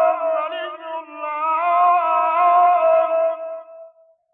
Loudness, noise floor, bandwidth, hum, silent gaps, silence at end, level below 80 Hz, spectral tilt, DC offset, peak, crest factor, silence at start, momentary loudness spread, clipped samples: -18 LUFS; -49 dBFS; 3.8 kHz; none; none; 0.45 s; -74 dBFS; -5.5 dB/octave; under 0.1%; -6 dBFS; 12 dB; 0 s; 16 LU; under 0.1%